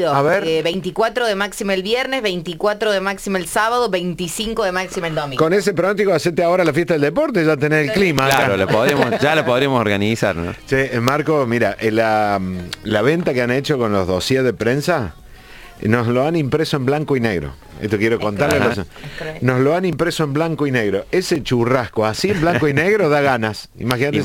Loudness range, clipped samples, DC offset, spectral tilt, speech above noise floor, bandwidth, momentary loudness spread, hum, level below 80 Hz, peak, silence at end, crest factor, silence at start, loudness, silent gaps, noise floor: 4 LU; under 0.1%; under 0.1%; -5.5 dB/octave; 22 dB; 17 kHz; 6 LU; none; -44 dBFS; 0 dBFS; 0 s; 18 dB; 0 s; -17 LUFS; none; -39 dBFS